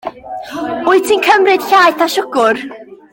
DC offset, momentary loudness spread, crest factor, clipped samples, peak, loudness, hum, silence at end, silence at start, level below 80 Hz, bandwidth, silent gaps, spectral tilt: under 0.1%; 16 LU; 14 dB; under 0.1%; 0 dBFS; -12 LUFS; none; 0.2 s; 0.05 s; -56 dBFS; 17 kHz; none; -2.5 dB/octave